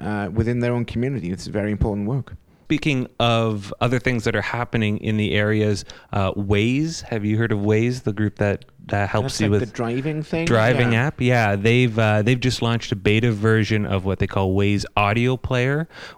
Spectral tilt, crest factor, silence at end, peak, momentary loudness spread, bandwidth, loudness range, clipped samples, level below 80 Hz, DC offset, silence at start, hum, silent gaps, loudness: -6.5 dB/octave; 18 dB; 0.05 s; -2 dBFS; 7 LU; 12 kHz; 4 LU; under 0.1%; -42 dBFS; under 0.1%; 0 s; none; none; -21 LUFS